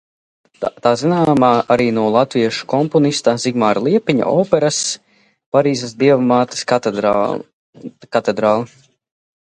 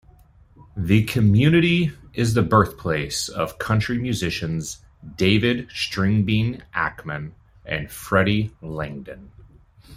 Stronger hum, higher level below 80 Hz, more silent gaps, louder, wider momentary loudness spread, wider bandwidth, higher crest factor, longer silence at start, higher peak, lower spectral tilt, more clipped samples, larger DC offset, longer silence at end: neither; second, -56 dBFS vs -46 dBFS; first, 5.46-5.52 s, 7.53-7.73 s vs none; first, -16 LUFS vs -22 LUFS; second, 9 LU vs 15 LU; second, 11.5 kHz vs 16 kHz; about the same, 16 dB vs 20 dB; about the same, 0.6 s vs 0.6 s; about the same, 0 dBFS vs -2 dBFS; about the same, -5 dB/octave vs -6 dB/octave; neither; neither; first, 0.8 s vs 0 s